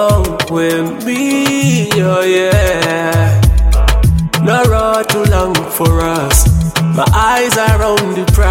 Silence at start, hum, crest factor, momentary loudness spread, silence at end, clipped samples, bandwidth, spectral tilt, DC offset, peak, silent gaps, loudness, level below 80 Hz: 0 s; none; 10 dB; 3 LU; 0 s; under 0.1%; 17 kHz; -5 dB/octave; under 0.1%; 0 dBFS; none; -12 LUFS; -16 dBFS